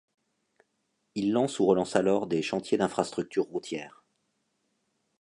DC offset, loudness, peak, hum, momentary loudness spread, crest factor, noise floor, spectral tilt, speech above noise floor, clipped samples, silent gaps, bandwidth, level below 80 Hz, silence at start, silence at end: under 0.1%; -28 LUFS; -8 dBFS; none; 13 LU; 22 dB; -77 dBFS; -5.5 dB/octave; 50 dB; under 0.1%; none; 11 kHz; -68 dBFS; 1.15 s; 1.35 s